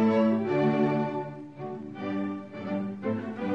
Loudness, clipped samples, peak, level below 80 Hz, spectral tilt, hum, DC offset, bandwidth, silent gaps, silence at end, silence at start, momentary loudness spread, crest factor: -29 LUFS; under 0.1%; -14 dBFS; -68 dBFS; -9 dB/octave; none; under 0.1%; 6.2 kHz; none; 0 s; 0 s; 14 LU; 14 dB